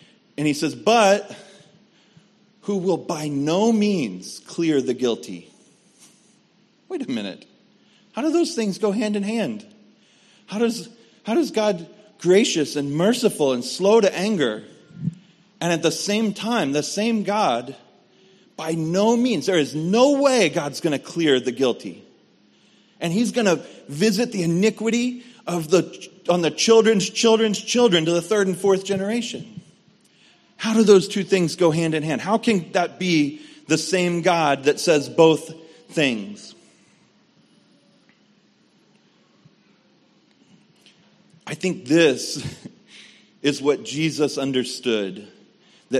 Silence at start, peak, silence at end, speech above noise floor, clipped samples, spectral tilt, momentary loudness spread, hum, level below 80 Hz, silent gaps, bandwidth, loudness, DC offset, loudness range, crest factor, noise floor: 0.4 s; -2 dBFS; 0 s; 39 dB; under 0.1%; -4.5 dB/octave; 15 LU; none; -68 dBFS; none; 13 kHz; -21 LUFS; under 0.1%; 6 LU; 20 dB; -59 dBFS